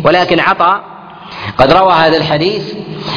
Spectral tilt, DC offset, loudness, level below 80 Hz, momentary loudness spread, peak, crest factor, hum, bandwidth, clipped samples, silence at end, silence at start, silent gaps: -6.5 dB/octave; under 0.1%; -10 LUFS; -38 dBFS; 16 LU; 0 dBFS; 12 dB; none; 5.4 kHz; 0.3%; 0 s; 0 s; none